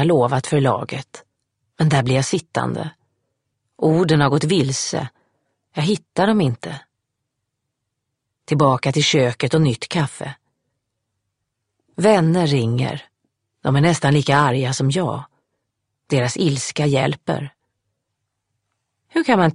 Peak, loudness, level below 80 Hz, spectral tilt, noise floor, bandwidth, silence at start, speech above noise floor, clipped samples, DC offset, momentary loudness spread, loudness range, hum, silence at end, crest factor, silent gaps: 0 dBFS; -19 LUFS; -56 dBFS; -5.5 dB/octave; -78 dBFS; 11 kHz; 0 s; 60 dB; under 0.1%; under 0.1%; 14 LU; 4 LU; none; 0 s; 20 dB; none